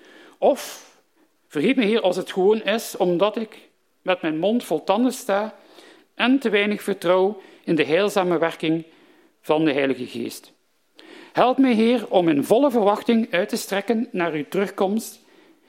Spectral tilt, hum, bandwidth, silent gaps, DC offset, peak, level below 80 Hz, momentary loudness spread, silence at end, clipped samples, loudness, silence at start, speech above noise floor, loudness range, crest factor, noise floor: -5 dB/octave; none; 16.5 kHz; none; under 0.1%; 0 dBFS; -74 dBFS; 12 LU; 0.55 s; under 0.1%; -21 LUFS; 0.4 s; 43 dB; 4 LU; 20 dB; -63 dBFS